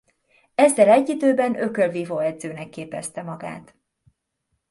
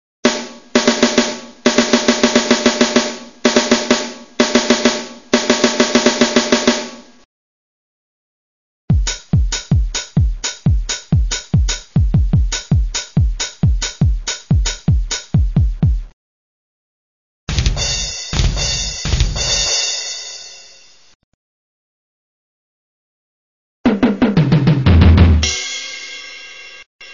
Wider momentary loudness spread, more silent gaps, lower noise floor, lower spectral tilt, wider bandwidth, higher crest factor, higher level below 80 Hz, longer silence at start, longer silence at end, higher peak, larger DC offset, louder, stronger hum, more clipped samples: first, 18 LU vs 11 LU; second, none vs 7.25-8.88 s, 16.13-17.47 s, 21.15-23.84 s, 26.86-26.99 s; first, -75 dBFS vs -45 dBFS; about the same, -5 dB/octave vs -4.5 dB/octave; first, 11.5 kHz vs 7.4 kHz; about the same, 20 dB vs 16 dB; second, -70 dBFS vs -22 dBFS; first, 0.6 s vs 0.25 s; first, 1.1 s vs 0 s; about the same, -2 dBFS vs 0 dBFS; second, under 0.1% vs 0.4%; second, -20 LUFS vs -16 LUFS; neither; neither